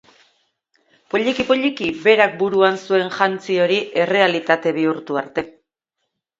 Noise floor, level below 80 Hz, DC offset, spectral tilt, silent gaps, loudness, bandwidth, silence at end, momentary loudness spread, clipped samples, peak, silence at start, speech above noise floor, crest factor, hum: -77 dBFS; -60 dBFS; under 0.1%; -5 dB/octave; none; -18 LUFS; 7.8 kHz; 0.9 s; 9 LU; under 0.1%; 0 dBFS; 1.15 s; 59 dB; 20 dB; none